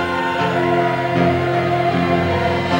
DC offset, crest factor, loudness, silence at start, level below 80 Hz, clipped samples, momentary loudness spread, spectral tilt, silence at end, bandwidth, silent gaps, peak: under 0.1%; 14 dB; -17 LUFS; 0 s; -48 dBFS; under 0.1%; 2 LU; -7 dB/octave; 0 s; 16 kHz; none; -4 dBFS